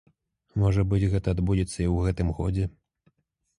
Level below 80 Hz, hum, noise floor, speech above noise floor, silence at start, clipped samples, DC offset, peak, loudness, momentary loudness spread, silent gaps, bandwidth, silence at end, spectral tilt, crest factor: -36 dBFS; none; -69 dBFS; 44 dB; 0.55 s; under 0.1%; under 0.1%; -10 dBFS; -26 LUFS; 6 LU; none; 11 kHz; 0.9 s; -8 dB/octave; 16 dB